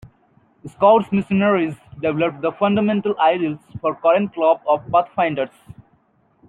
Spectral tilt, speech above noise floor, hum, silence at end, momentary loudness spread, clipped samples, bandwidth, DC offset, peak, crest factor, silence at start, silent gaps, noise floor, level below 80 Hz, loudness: -8.5 dB/octave; 42 dB; none; 0.75 s; 10 LU; under 0.1%; 4.1 kHz; under 0.1%; -2 dBFS; 18 dB; 0.65 s; none; -60 dBFS; -58 dBFS; -19 LUFS